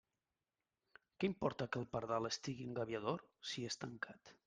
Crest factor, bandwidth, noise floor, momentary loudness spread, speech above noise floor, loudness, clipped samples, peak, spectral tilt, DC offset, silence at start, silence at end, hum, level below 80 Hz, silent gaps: 22 dB; 9.6 kHz; under -90 dBFS; 7 LU; over 47 dB; -43 LUFS; under 0.1%; -22 dBFS; -4.5 dB/octave; under 0.1%; 1.2 s; 0.15 s; none; -74 dBFS; none